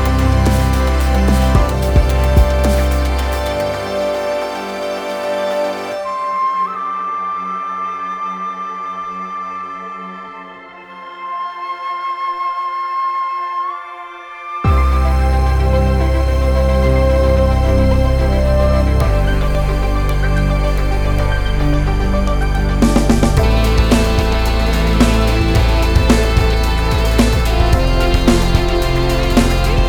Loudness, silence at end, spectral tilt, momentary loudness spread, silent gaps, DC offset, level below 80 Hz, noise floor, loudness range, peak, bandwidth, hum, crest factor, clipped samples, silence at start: -16 LUFS; 0 s; -6 dB/octave; 11 LU; none; under 0.1%; -16 dBFS; -35 dBFS; 9 LU; 0 dBFS; 19 kHz; none; 14 dB; under 0.1%; 0 s